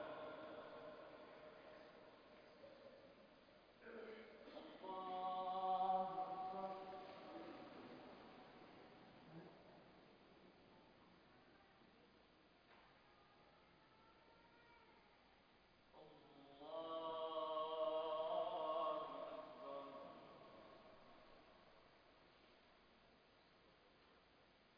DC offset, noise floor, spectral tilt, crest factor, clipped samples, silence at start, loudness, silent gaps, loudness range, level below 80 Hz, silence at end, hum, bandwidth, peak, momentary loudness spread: under 0.1%; -72 dBFS; -2.5 dB/octave; 22 dB; under 0.1%; 0 s; -49 LUFS; none; 23 LU; -84 dBFS; 0 s; none; 5.2 kHz; -32 dBFS; 25 LU